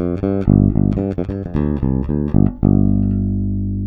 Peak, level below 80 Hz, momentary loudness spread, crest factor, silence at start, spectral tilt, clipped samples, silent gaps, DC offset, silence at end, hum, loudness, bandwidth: 0 dBFS; -26 dBFS; 7 LU; 16 dB; 0 s; -12.5 dB/octave; under 0.1%; none; under 0.1%; 0 s; 50 Hz at -30 dBFS; -17 LUFS; 3.6 kHz